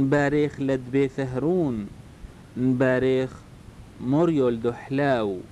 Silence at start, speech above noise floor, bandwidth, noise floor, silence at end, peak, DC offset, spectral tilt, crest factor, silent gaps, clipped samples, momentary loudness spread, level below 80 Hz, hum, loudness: 0 s; 22 dB; 11 kHz; -45 dBFS; 0.05 s; -12 dBFS; under 0.1%; -8 dB/octave; 12 dB; none; under 0.1%; 12 LU; -50 dBFS; none; -24 LUFS